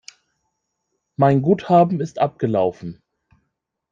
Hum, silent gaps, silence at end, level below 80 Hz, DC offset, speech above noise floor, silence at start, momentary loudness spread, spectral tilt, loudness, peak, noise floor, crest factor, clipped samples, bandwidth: none; none; 1 s; -60 dBFS; under 0.1%; 58 dB; 1.2 s; 20 LU; -8.5 dB/octave; -18 LUFS; -2 dBFS; -76 dBFS; 18 dB; under 0.1%; 7.6 kHz